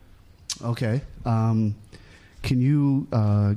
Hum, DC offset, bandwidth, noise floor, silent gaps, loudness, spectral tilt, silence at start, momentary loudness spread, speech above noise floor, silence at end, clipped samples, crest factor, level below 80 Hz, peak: none; under 0.1%; 12 kHz; -45 dBFS; none; -24 LUFS; -7 dB/octave; 0.5 s; 13 LU; 23 dB; 0 s; under 0.1%; 14 dB; -46 dBFS; -10 dBFS